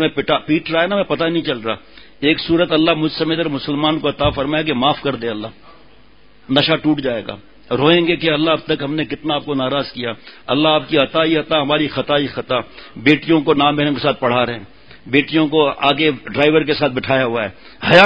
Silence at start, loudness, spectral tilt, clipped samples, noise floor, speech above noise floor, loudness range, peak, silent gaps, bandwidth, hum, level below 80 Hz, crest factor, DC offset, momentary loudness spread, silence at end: 0 s; -17 LUFS; -7 dB/octave; under 0.1%; -50 dBFS; 33 dB; 3 LU; 0 dBFS; none; 8 kHz; none; -46 dBFS; 16 dB; 0.6%; 10 LU; 0 s